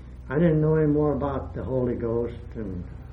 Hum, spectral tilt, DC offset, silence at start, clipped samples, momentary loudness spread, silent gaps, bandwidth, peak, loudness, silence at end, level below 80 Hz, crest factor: none; -11.5 dB/octave; under 0.1%; 0 s; under 0.1%; 13 LU; none; 3.9 kHz; -8 dBFS; -25 LUFS; 0 s; -40 dBFS; 16 dB